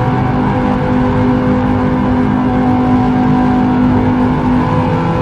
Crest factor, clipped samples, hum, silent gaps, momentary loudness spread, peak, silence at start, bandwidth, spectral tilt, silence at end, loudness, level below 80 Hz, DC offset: 10 dB; under 0.1%; none; none; 2 LU; -2 dBFS; 0 s; 6.6 kHz; -9 dB/octave; 0 s; -12 LUFS; -26 dBFS; 0.2%